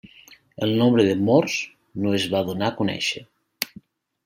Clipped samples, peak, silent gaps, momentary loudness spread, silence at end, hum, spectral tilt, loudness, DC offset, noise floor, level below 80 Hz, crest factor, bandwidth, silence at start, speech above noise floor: under 0.1%; 0 dBFS; none; 13 LU; 0.6 s; none; -5.5 dB/octave; -22 LUFS; under 0.1%; -51 dBFS; -64 dBFS; 24 dB; 16 kHz; 0.3 s; 30 dB